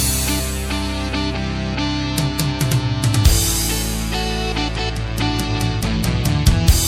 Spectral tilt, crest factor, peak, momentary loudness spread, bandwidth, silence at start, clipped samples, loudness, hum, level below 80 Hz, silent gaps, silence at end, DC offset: -4 dB/octave; 18 dB; 0 dBFS; 7 LU; 17 kHz; 0 s; under 0.1%; -19 LUFS; none; -24 dBFS; none; 0 s; under 0.1%